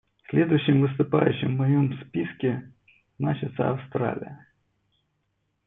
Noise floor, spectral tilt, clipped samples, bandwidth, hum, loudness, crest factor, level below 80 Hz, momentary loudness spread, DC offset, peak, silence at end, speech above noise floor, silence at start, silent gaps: -75 dBFS; -11.5 dB/octave; under 0.1%; 3.9 kHz; none; -25 LUFS; 20 dB; -64 dBFS; 9 LU; under 0.1%; -6 dBFS; 1.3 s; 51 dB; 0.3 s; none